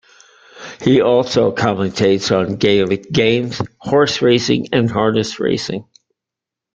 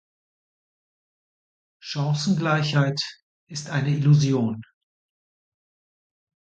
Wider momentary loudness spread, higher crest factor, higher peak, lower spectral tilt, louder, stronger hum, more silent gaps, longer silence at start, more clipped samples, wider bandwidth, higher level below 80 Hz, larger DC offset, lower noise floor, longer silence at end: second, 9 LU vs 16 LU; about the same, 16 dB vs 18 dB; first, 0 dBFS vs -8 dBFS; about the same, -5.5 dB/octave vs -6 dB/octave; first, -16 LUFS vs -23 LUFS; neither; second, none vs 3.22-3.47 s; second, 0.55 s vs 1.85 s; neither; about the same, 8.8 kHz vs 8.6 kHz; first, -50 dBFS vs -66 dBFS; neither; second, -85 dBFS vs under -90 dBFS; second, 0.9 s vs 1.8 s